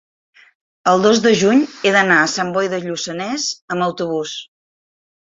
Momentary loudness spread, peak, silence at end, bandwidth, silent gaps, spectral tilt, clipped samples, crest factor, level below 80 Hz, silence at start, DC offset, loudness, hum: 11 LU; -2 dBFS; 0.9 s; 8 kHz; 3.62-3.68 s; -4 dB/octave; under 0.1%; 16 dB; -60 dBFS; 0.85 s; under 0.1%; -16 LUFS; none